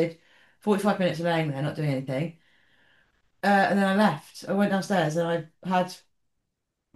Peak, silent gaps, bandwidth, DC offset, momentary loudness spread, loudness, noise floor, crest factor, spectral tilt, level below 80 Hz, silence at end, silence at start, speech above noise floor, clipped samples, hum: -8 dBFS; none; 12.5 kHz; under 0.1%; 10 LU; -26 LUFS; -81 dBFS; 18 dB; -6.5 dB/octave; -70 dBFS; 1 s; 0 s; 56 dB; under 0.1%; none